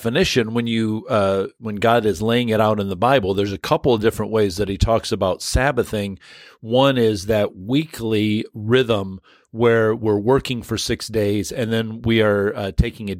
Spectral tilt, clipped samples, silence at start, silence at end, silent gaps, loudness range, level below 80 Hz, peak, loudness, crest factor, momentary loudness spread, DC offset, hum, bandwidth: -5.5 dB/octave; under 0.1%; 0 s; 0 s; none; 2 LU; -36 dBFS; -2 dBFS; -19 LUFS; 18 dB; 6 LU; under 0.1%; none; 16.5 kHz